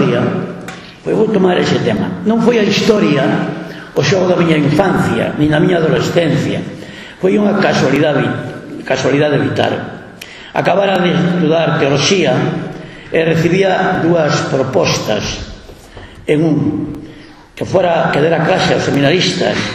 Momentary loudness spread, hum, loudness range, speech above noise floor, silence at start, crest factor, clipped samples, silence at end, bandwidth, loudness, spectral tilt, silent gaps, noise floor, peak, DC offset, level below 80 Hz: 14 LU; none; 3 LU; 24 dB; 0 s; 14 dB; under 0.1%; 0 s; 14 kHz; -13 LUFS; -5.5 dB/octave; none; -36 dBFS; 0 dBFS; under 0.1%; -42 dBFS